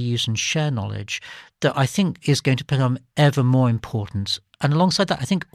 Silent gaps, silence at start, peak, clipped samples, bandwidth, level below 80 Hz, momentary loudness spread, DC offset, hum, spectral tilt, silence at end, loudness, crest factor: none; 0 s; -4 dBFS; under 0.1%; 14 kHz; -54 dBFS; 9 LU; under 0.1%; none; -5.5 dB/octave; 0.1 s; -21 LUFS; 16 dB